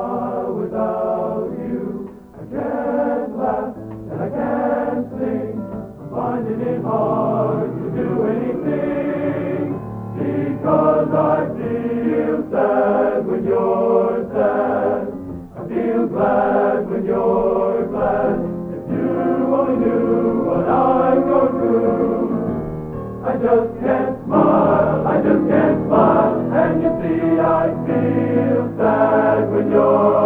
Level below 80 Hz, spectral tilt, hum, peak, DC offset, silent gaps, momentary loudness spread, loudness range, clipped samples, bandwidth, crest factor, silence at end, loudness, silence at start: -46 dBFS; -10.5 dB/octave; none; 0 dBFS; under 0.1%; none; 10 LU; 7 LU; under 0.1%; 4.8 kHz; 18 dB; 0 s; -18 LUFS; 0 s